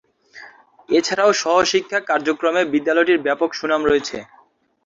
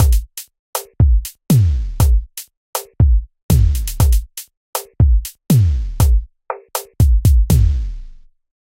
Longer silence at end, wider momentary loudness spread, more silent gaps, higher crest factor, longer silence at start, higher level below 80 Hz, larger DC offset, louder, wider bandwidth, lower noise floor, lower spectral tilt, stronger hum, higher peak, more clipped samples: about the same, 0.6 s vs 0.5 s; second, 5 LU vs 16 LU; second, none vs 0.59-0.73 s, 2.57-2.73 s, 3.43-3.49 s, 4.57-4.73 s; about the same, 16 dB vs 14 dB; first, 0.35 s vs 0 s; second, -56 dBFS vs -18 dBFS; neither; about the same, -18 LUFS vs -17 LUFS; second, 7.8 kHz vs 17 kHz; first, -45 dBFS vs -37 dBFS; second, -3 dB/octave vs -6 dB/octave; neither; about the same, -2 dBFS vs 0 dBFS; neither